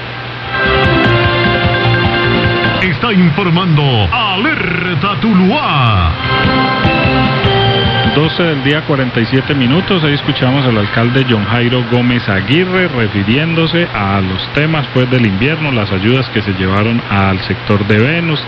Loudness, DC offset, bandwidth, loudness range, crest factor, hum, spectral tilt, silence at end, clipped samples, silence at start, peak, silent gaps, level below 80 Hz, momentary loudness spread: -12 LUFS; under 0.1%; 6.2 kHz; 2 LU; 12 dB; none; -8 dB/octave; 0 s; under 0.1%; 0 s; 0 dBFS; none; -32 dBFS; 3 LU